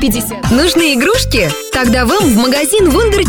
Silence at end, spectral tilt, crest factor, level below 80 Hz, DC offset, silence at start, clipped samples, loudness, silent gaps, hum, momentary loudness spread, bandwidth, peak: 0 s; -4 dB/octave; 10 dB; -24 dBFS; under 0.1%; 0 s; under 0.1%; -11 LUFS; none; none; 4 LU; 19.5 kHz; -2 dBFS